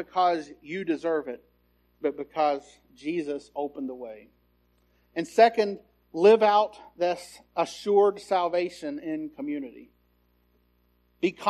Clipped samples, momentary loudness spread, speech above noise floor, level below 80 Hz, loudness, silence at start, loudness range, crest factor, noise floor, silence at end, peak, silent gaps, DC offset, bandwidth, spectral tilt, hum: under 0.1%; 16 LU; 41 dB; -68 dBFS; -26 LUFS; 0 s; 9 LU; 22 dB; -67 dBFS; 0 s; -6 dBFS; none; under 0.1%; 12.5 kHz; -5 dB/octave; 60 Hz at -65 dBFS